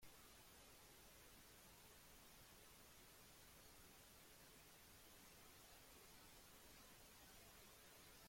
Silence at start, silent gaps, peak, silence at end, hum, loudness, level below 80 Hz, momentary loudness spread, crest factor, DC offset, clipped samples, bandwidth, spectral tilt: 0 s; none; -52 dBFS; 0 s; none; -65 LUFS; -76 dBFS; 1 LU; 14 dB; under 0.1%; under 0.1%; 16.5 kHz; -2 dB/octave